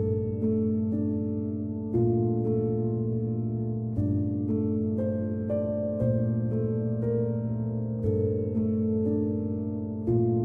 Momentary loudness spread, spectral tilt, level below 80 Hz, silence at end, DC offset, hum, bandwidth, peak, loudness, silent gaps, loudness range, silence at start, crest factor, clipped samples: 4 LU; -13.5 dB/octave; -52 dBFS; 0 s; under 0.1%; none; 2.4 kHz; -14 dBFS; -28 LUFS; none; 1 LU; 0 s; 14 dB; under 0.1%